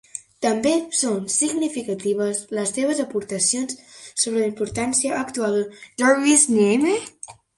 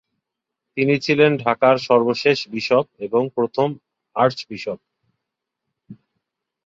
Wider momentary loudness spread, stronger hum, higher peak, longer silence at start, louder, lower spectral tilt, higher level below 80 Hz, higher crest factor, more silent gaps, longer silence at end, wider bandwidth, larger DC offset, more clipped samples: second, 10 LU vs 14 LU; neither; about the same, -4 dBFS vs -2 dBFS; second, 0.15 s vs 0.75 s; about the same, -21 LUFS vs -19 LUFS; second, -3 dB/octave vs -6 dB/octave; about the same, -60 dBFS vs -64 dBFS; about the same, 18 dB vs 20 dB; neither; second, 0.25 s vs 0.7 s; first, 11.5 kHz vs 7.6 kHz; neither; neither